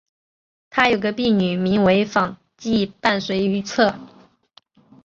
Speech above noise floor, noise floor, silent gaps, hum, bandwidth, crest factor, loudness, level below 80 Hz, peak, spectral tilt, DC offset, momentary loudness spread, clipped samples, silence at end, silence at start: 37 dB; -56 dBFS; none; none; 7.4 kHz; 20 dB; -20 LUFS; -54 dBFS; -2 dBFS; -5.5 dB/octave; under 0.1%; 7 LU; under 0.1%; 0.95 s; 0.75 s